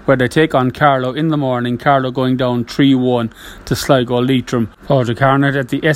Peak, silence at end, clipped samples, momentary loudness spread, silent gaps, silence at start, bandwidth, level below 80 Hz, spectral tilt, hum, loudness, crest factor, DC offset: 0 dBFS; 0 s; under 0.1%; 7 LU; none; 0.05 s; 16 kHz; -44 dBFS; -6.5 dB/octave; none; -15 LUFS; 14 dB; under 0.1%